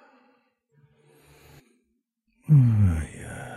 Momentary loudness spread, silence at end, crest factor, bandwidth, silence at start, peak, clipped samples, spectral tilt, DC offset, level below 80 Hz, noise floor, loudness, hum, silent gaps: 20 LU; 0 s; 16 dB; 12 kHz; 2.5 s; -10 dBFS; under 0.1%; -8.5 dB/octave; under 0.1%; -44 dBFS; -75 dBFS; -21 LUFS; none; none